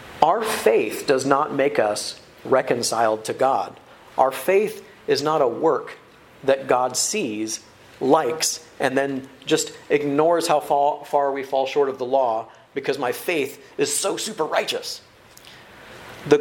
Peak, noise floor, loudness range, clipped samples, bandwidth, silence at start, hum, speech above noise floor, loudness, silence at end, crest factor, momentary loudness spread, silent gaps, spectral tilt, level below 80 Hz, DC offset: 0 dBFS; -47 dBFS; 3 LU; under 0.1%; 17 kHz; 0 s; none; 26 dB; -22 LUFS; 0 s; 22 dB; 10 LU; none; -3 dB/octave; -64 dBFS; under 0.1%